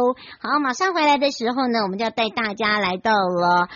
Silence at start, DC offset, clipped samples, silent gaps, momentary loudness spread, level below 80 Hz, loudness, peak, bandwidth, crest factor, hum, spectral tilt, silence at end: 0 s; under 0.1%; under 0.1%; none; 5 LU; -60 dBFS; -20 LUFS; -8 dBFS; 7.2 kHz; 12 dB; none; -2 dB/octave; 0 s